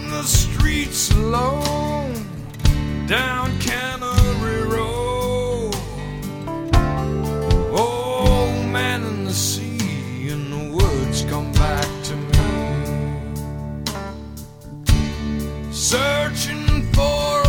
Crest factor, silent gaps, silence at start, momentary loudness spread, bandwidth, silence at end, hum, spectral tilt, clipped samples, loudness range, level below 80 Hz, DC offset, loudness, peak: 18 dB; none; 0 s; 10 LU; 19 kHz; 0 s; none; -4.5 dB/octave; under 0.1%; 3 LU; -26 dBFS; under 0.1%; -21 LUFS; 0 dBFS